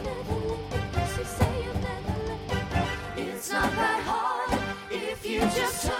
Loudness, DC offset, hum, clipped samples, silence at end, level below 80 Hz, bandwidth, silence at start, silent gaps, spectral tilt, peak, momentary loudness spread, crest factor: -29 LUFS; under 0.1%; none; under 0.1%; 0 s; -40 dBFS; 17 kHz; 0 s; none; -4.5 dB/octave; -10 dBFS; 7 LU; 20 dB